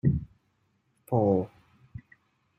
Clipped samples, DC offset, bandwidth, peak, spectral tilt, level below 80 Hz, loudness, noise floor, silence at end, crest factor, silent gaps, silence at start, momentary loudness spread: under 0.1%; under 0.1%; 14 kHz; -12 dBFS; -11.5 dB/octave; -50 dBFS; -28 LUFS; -72 dBFS; 0.6 s; 20 dB; none; 0.05 s; 24 LU